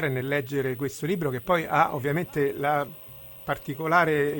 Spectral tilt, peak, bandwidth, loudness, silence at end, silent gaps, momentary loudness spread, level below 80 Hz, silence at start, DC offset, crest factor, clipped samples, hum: -6 dB/octave; -6 dBFS; 17 kHz; -26 LUFS; 0 s; none; 11 LU; -58 dBFS; 0 s; under 0.1%; 20 dB; under 0.1%; none